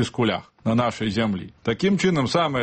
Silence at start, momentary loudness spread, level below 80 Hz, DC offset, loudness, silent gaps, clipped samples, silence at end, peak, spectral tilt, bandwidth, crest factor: 0 s; 7 LU; -52 dBFS; under 0.1%; -23 LUFS; none; under 0.1%; 0 s; -8 dBFS; -6 dB/octave; 8.8 kHz; 14 dB